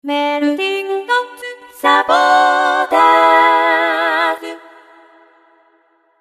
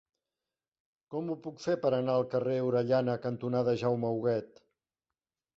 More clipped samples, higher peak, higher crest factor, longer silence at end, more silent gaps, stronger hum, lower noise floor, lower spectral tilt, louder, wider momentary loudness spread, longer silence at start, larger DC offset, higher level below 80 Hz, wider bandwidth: neither; first, 0 dBFS vs -16 dBFS; about the same, 14 dB vs 16 dB; first, 1.65 s vs 1.1 s; neither; neither; second, -56 dBFS vs under -90 dBFS; second, -1.5 dB/octave vs -8 dB/octave; first, -13 LUFS vs -31 LUFS; first, 13 LU vs 8 LU; second, 0.05 s vs 1.1 s; neither; first, -66 dBFS vs -72 dBFS; first, 14 kHz vs 7.6 kHz